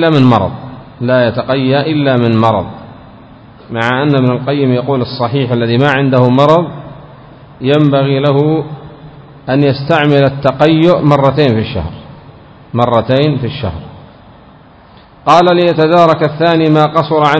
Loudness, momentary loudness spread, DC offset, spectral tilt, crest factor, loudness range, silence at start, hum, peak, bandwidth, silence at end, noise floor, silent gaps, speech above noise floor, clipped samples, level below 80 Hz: -11 LUFS; 14 LU; under 0.1%; -8 dB/octave; 12 dB; 3 LU; 0 s; none; 0 dBFS; 8 kHz; 0 s; -39 dBFS; none; 30 dB; 0.9%; -40 dBFS